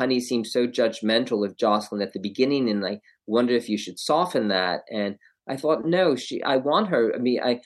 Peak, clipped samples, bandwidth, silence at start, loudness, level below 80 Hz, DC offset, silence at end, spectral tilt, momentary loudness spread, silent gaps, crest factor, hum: -6 dBFS; under 0.1%; 12.5 kHz; 0 s; -24 LUFS; -76 dBFS; under 0.1%; 0.05 s; -5 dB/octave; 8 LU; none; 18 dB; none